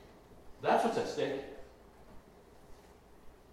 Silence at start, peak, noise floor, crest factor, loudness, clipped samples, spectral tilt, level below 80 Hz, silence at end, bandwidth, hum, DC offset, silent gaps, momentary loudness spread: 0 s; -16 dBFS; -58 dBFS; 22 dB; -33 LUFS; under 0.1%; -5 dB/octave; -62 dBFS; 0.2 s; 16 kHz; none; under 0.1%; none; 26 LU